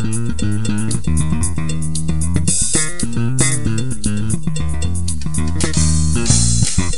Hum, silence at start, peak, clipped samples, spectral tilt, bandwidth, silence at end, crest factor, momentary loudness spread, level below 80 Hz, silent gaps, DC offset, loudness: none; 0 s; 0 dBFS; under 0.1%; -4 dB/octave; 12 kHz; 0 s; 18 dB; 7 LU; -26 dBFS; none; 10%; -18 LUFS